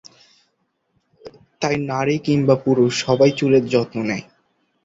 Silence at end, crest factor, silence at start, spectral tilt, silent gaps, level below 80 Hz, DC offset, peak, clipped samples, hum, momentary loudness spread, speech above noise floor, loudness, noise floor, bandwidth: 0.6 s; 18 dB; 1.25 s; -6 dB/octave; none; -56 dBFS; under 0.1%; -2 dBFS; under 0.1%; none; 9 LU; 52 dB; -19 LUFS; -69 dBFS; 8 kHz